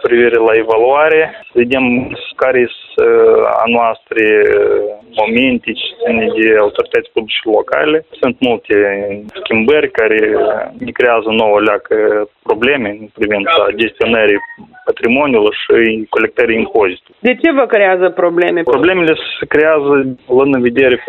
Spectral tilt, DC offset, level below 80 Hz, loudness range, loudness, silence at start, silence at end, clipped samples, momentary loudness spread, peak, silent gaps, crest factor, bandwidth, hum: -7 dB/octave; under 0.1%; -48 dBFS; 2 LU; -12 LUFS; 0 s; 0 s; under 0.1%; 7 LU; 0 dBFS; none; 12 dB; 4.2 kHz; none